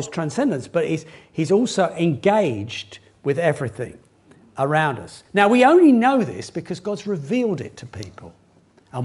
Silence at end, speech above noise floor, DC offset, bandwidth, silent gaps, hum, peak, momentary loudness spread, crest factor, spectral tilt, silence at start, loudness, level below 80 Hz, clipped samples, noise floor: 0 s; 36 dB; under 0.1%; 11.5 kHz; none; none; 0 dBFS; 20 LU; 20 dB; -6 dB/octave; 0 s; -20 LUFS; -60 dBFS; under 0.1%; -55 dBFS